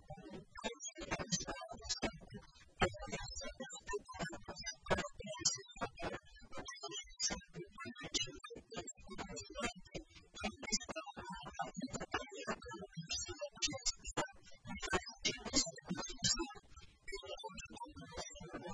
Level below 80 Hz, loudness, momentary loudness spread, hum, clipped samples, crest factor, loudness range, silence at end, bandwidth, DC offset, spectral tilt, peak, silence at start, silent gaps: -58 dBFS; -42 LUFS; 15 LU; none; under 0.1%; 26 dB; 5 LU; 0 s; 10.5 kHz; under 0.1%; -2 dB/octave; -18 dBFS; 0 s; none